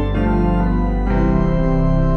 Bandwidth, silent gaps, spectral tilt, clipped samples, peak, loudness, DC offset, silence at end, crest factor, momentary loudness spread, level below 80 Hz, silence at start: 4.4 kHz; none; -10 dB/octave; under 0.1%; -6 dBFS; -18 LUFS; under 0.1%; 0 s; 10 dB; 2 LU; -20 dBFS; 0 s